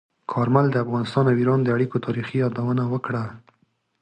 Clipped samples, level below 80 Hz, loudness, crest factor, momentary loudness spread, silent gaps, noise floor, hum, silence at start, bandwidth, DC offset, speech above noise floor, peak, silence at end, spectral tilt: under 0.1%; -60 dBFS; -22 LUFS; 16 dB; 9 LU; none; -67 dBFS; none; 0.3 s; 9 kHz; under 0.1%; 45 dB; -6 dBFS; 0.65 s; -9 dB/octave